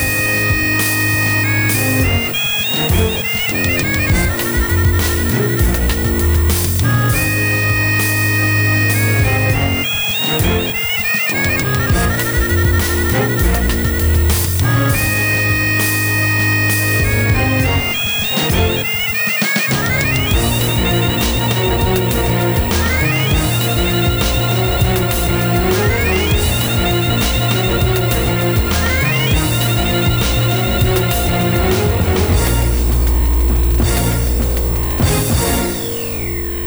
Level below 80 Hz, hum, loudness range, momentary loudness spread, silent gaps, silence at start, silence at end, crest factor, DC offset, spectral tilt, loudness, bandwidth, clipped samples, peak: -22 dBFS; none; 1 LU; 2 LU; none; 0 s; 0 s; 14 dB; under 0.1%; -4.5 dB/octave; -14 LUFS; over 20 kHz; under 0.1%; -2 dBFS